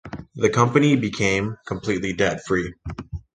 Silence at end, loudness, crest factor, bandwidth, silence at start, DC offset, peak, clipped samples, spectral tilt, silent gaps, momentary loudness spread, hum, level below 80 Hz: 0.15 s; -21 LUFS; 20 dB; 9.8 kHz; 0.05 s; under 0.1%; -2 dBFS; under 0.1%; -5.5 dB/octave; none; 16 LU; none; -44 dBFS